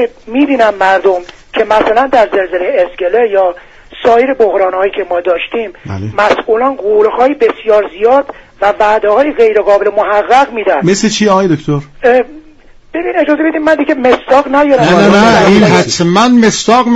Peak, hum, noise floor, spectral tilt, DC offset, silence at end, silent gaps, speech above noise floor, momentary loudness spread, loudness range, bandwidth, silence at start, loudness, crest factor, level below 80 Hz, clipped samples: 0 dBFS; none; -38 dBFS; -5 dB/octave; under 0.1%; 0 s; none; 29 dB; 8 LU; 4 LU; 10 kHz; 0 s; -9 LUFS; 10 dB; -40 dBFS; 0.1%